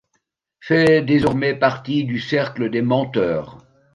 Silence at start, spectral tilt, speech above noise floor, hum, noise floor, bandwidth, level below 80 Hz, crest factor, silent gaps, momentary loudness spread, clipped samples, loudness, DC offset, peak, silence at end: 0.65 s; -7.5 dB/octave; 53 dB; none; -71 dBFS; 11 kHz; -50 dBFS; 16 dB; none; 8 LU; under 0.1%; -19 LUFS; under 0.1%; -2 dBFS; 0.4 s